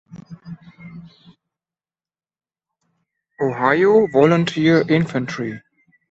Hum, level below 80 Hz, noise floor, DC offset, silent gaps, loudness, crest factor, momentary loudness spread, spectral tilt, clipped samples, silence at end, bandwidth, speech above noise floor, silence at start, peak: none; -60 dBFS; under -90 dBFS; under 0.1%; none; -17 LUFS; 18 dB; 25 LU; -7 dB/octave; under 0.1%; 0.5 s; 8 kHz; over 74 dB; 0.15 s; -2 dBFS